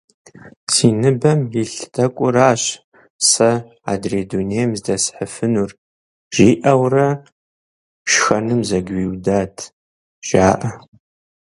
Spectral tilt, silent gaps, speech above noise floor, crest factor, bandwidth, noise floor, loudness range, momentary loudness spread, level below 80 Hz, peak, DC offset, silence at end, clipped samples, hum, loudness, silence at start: -4.5 dB/octave; 0.56-0.67 s, 2.84-2.92 s, 3.10-3.19 s, 5.78-6.31 s, 7.32-8.05 s, 9.73-10.22 s; over 73 dB; 18 dB; 11.5 kHz; under -90 dBFS; 3 LU; 13 LU; -46 dBFS; 0 dBFS; under 0.1%; 0.75 s; under 0.1%; none; -17 LUFS; 0.45 s